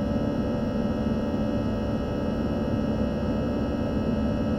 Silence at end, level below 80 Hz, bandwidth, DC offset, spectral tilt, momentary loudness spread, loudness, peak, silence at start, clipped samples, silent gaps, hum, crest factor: 0 s; -38 dBFS; 7.6 kHz; under 0.1%; -8.5 dB/octave; 1 LU; -27 LUFS; -14 dBFS; 0 s; under 0.1%; none; none; 12 dB